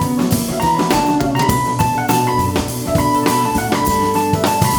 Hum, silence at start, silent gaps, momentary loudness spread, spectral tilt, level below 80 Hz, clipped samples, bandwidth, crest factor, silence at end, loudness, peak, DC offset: none; 0 s; none; 2 LU; -5 dB/octave; -34 dBFS; under 0.1%; over 20 kHz; 16 dB; 0 s; -16 LUFS; 0 dBFS; under 0.1%